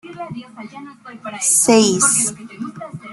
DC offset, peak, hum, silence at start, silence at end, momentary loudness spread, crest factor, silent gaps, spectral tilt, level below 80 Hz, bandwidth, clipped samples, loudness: under 0.1%; -2 dBFS; none; 0.05 s; 0 s; 23 LU; 18 dB; none; -2.5 dB/octave; -60 dBFS; 12.5 kHz; under 0.1%; -13 LUFS